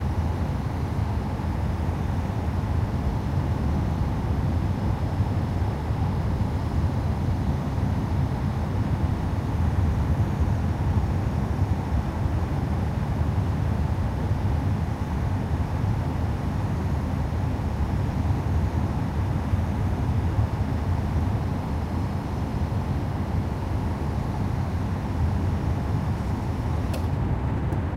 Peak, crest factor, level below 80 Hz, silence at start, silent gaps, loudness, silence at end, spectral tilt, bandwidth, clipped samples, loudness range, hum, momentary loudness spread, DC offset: -10 dBFS; 14 dB; -30 dBFS; 0 s; none; -26 LUFS; 0 s; -8 dB/octave; 13 kHz; under 0.1%; 2 LU; none; 3 LU; under 0.1%